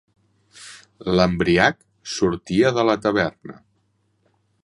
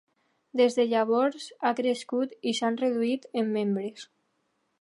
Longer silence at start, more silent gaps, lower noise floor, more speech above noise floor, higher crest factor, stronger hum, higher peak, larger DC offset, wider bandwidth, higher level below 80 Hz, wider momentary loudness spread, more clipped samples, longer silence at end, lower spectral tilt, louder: about the same, 0.6 s vs 0.55 s; neither; second, -67 dBFS vs -75 dBFS; about the same, 47 dB vs 48 dB; first, 22 dB vs 16 dB; neither; first, -2 dBFS vs -12 dBFS; neither; about the same, 11.5 kHz vs 11.5 kHz; first, -46 dBFS vs -84 dBFS; first, 23 LU vs 7 LU; neither; first, 1.1 s vs 0.75 s; about the same, -5.5 dB/octave vs -5 dB/octave; first, -20 LUFS vs -27 LUFS